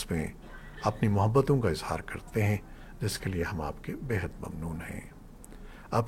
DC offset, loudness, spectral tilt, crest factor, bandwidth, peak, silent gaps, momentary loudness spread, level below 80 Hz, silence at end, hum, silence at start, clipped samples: under 0.1%; -31 LUFS; -6.5 dB/octave; 20 dB; 16.5 kHz; -12 dBFS; none; 24 LU; -46 dBFS; 0 s; none; 0 s; under 0.1%